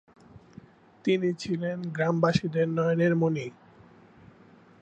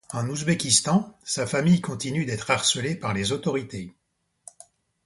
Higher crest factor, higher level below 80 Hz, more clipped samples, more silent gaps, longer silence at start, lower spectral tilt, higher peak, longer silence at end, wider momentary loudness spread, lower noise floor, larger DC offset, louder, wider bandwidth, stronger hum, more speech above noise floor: about the same, 20 dB vs 20 dB; second, -64 dBFS vs -56 dBFS; neither; neither; first, 0.35 s vs 0.1 s; first, -7 dB/octave vs -4 dB/octave; second, -10 dBFS vs -6 dBFS; first, 1.3 s vs 1.15 s; about the same, 8 LU vs 10 LU; second, -55 dBFS vs -75 dBFS; neither; second, -27 LUFS vs -24 LUFS; second, 8.4 kHz vs 11.5 kHz; neither; second, 29 dB vs 50 dB